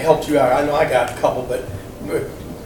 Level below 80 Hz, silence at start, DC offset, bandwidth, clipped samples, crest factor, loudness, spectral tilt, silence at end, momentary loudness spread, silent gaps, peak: -40 dBFS; 0 s; under 0.1%; 19 kHz; under 0.1%; 18 dB; -18 LUFS; -5.5 dB/octave; 0 s; 14 LU; none; 0 dBFS